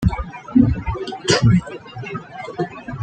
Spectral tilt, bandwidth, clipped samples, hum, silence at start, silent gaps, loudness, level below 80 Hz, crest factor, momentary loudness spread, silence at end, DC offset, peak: -6 dB/octave; 9.4 kHz; under 0.1%; none; 0 s; none; -19 LUFS; -32 dBFS; 18 dB; 16 LU; 0 s; under 0.1%; -2 dBFS